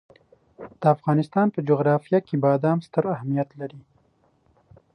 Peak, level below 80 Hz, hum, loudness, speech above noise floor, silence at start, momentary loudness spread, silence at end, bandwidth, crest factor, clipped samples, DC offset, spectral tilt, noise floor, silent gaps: -6 dBFS; -68 dBFS; none; -23 LUFS; 41 dB; 0.6 s; 15 LU; 1.15 s; 9.6 kHz; 18 dB; under 0.1%; under 0.1%; -10 dB/octave; -64 dBFS; none